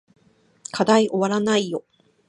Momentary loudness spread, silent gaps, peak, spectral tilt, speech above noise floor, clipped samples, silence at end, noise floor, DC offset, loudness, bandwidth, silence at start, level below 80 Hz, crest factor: 15 LU; none; -4 dBFS; -4.5 dB/octave; 25 dB; under 0.1%; 0.5 s; -44 dBFS; under 0.1%; -20 LUFS; 11 kHz; 0.75 s; -68 dBFS; 20 dB